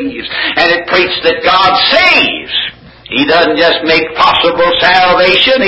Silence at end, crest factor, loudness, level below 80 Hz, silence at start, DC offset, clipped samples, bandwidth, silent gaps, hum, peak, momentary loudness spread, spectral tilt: 0 s; 10 dB; -8 LUFS; -40 dBFS; 0 s; under 0.1%; 0.3%; 8 kHz; none; none; 0 dBFS; 8 LU; -4.5 dB/octave